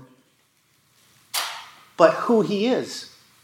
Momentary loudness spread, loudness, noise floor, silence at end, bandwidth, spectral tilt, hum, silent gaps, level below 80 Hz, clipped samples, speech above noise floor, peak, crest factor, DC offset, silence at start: 20 LU; -22 LUFS; -63 dBFS; 0.35 s; 17 kHz; -4.5 dB/octave; none; none; -80 dBFS; under 0.1%; 44 dB; -2 dBFS; 22 dB; under 0.1%; 1.35 s